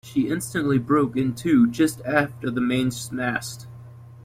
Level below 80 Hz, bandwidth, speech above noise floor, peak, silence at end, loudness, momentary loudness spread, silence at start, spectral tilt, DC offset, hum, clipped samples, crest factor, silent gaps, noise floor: -56 dBFS; 16 kHz; 20 dB; -6 dBFS; 0.05 s; -23 LUFS; 9 LU; 0.05 s; -5.5 dB/octave; under 0.1%; none; under 0.1%; 16 dB; none; -43 dBFS